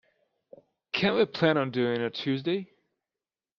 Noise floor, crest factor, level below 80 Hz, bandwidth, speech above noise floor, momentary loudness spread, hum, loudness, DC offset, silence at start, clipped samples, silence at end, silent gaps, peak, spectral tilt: under -90 dBFS; 20 dB; -68 dBFS; 7 kHz; over 63 dB; 7 LU; none; -27 LUFS; under 0.1%; 0.95 s; under 0.1%; 0.95 s; none; -10 dBFS; -7 dB/octave